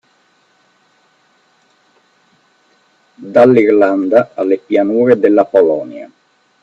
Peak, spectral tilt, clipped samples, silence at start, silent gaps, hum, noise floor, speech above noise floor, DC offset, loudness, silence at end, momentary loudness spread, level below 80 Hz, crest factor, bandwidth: 0 dBFS; -8.5 dB/octave; under 0.1%; 3.2 s; none; none; -55 dBFS; 45 dB; under 0.1%; -11 LUFS; 0.55 s; 9 LU; -62 dBFS; 14 dB; 7.6 kHz